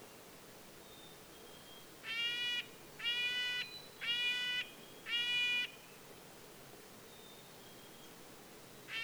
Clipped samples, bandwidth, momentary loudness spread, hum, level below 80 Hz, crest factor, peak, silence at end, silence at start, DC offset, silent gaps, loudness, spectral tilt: under 0.1%; over 20 kHz; 20 LU; none; -76 dBFS; 18 dB; -24 dBFS; 0 s; 0 s; under 0.1%; none; -36 LUFS; -0.5 dB/octave